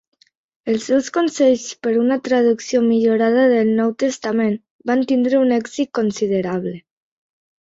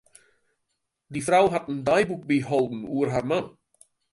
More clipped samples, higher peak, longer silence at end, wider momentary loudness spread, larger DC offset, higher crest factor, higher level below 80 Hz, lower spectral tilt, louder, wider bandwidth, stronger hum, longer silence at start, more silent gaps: neither; first, -4 dBFS vs -8 dBFS; first, 0.95 s vs 0.65 s; about the same, 8 LU vs 9 LU; neither; about the same, 14 dB vs 18 dB; about the same, -62 dBFS vs -58 dBFS; about the same, -5.5 dB/octave vs -5.5 dB/octave; first, -18 LUFS vs -24 LUFS; second, 7.8 kHz vs 11.5 kHz; neither; second, 0.65 s vs 1.1 s; first, 4.71-4.79 s vs none